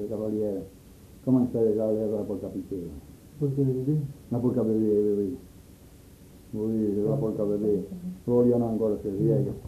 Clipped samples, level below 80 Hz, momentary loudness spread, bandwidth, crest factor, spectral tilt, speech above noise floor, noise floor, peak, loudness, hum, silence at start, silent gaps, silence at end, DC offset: under 0.1%; -54 dBFS; 13 LU; 14 kHz; 16 dB; -10.5 dB/octave; 24 dB; -50 dBFS; -12 dBFS; -27 LUFS; none; 0 s; none; 0 s; under 0.1%